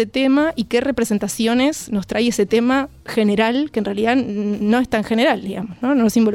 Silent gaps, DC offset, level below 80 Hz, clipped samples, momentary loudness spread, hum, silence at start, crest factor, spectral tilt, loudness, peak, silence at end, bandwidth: none; under 0.1%; -48 dBFS; under 0.1%; 6 LU; none; 0 s; 14 dB; -5 dB/octave; -18 LUFS; -4 dBFS; 0 s; 16.5 kHz